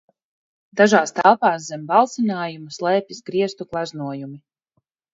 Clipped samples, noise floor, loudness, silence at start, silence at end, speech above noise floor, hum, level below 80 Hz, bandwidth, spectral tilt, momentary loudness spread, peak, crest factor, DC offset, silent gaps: under 0.1%; -72 dBFS; -20 LUFS; 0.75 s; 0.75 s; 52 dB; none; -68 dBFS; 8 kHz; -4.5 dB/octave; 14 LU; 0 dBFS; 20 dB; under 0.1%; none